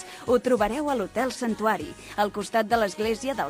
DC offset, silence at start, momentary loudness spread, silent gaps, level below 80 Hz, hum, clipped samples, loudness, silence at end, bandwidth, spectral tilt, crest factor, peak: under 0.1%; 0 s; 5 LU; none; -52 dBFS; none; under 0.1%; -26 LUFS; 0 s; 15.5 kHz; -4.5 dB/octave; 16 dB; -10 dBFS